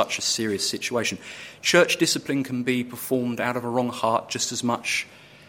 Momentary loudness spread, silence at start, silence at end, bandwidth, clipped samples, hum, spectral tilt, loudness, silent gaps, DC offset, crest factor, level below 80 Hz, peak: 8 LU; 0 s; 0.05 s; 16.5 kHz; under 0.1%; none; -3 dB/octave; -24 LUFS; none; under 0.1%; 22 dB; -66 dBFS; -4 dBFS